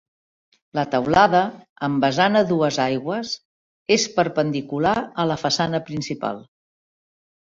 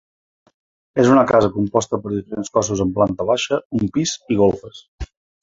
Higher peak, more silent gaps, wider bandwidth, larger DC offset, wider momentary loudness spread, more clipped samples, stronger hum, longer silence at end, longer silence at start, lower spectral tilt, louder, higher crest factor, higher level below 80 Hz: about the same, -2 dBFS vs -2 dBFS; first, 1.69-1.76 s, 3.45-3.86 s vs 3.65-3.70 s, 4.88-4.98 s; about the same, 7.8 kHz vs 8 kHz; neither; second, 12 LU vs 15 LU; neither; neither; first, 1.15 s vs 0.35 s; second, 0.75 s vs 0.95 s; about the same, -4.5 dB/octave vs -5.5 dB/octave; second, -21 LUFS vs -18 LUFS; about the same, 20 dB vs 18 dB; second, -56 dBFS vs -42 dBFS